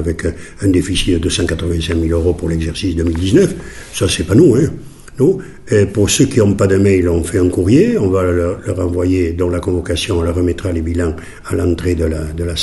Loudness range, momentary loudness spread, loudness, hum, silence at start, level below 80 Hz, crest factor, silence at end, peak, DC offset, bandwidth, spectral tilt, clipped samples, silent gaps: 4 LU; 8 LU; -15 LUFS; none; 0 s; -28 dBFS; 14 dB; 0 s; 0 dBFS; under 0.1%; 12 kHz; -6 dB/octave; under 0.1%; none